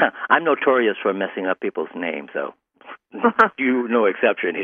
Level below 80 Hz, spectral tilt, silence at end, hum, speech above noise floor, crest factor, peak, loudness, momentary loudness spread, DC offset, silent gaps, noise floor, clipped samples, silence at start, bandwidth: -70 dBFS; -6.5 dB/octave; 0 s; none; 24 dB; 20 dB; -2 dBFS; -20 LUFS; 11 LU; under 0.1%; none; -44 dBFS; under 0.1%; 0 s; 7 kHz